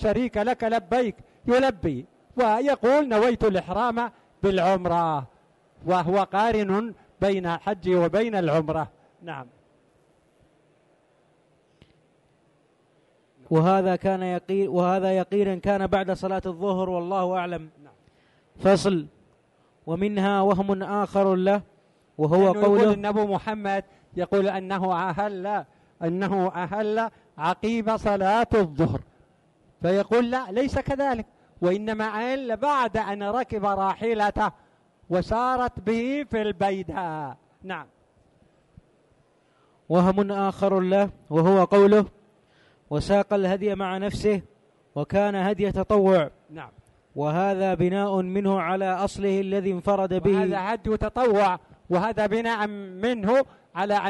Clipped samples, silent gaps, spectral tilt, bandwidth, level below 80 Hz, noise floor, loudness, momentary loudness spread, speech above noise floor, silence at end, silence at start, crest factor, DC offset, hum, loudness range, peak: under 0.1%; none; -7 dB/octave; 11.5 kHz; -50 dBFS; -63 dBFS; -24 LUFS; 11 LU; 40 dB; 0 s; 0 s; 16 dB; under 0.1%; none; 5 LU; -8 dBFS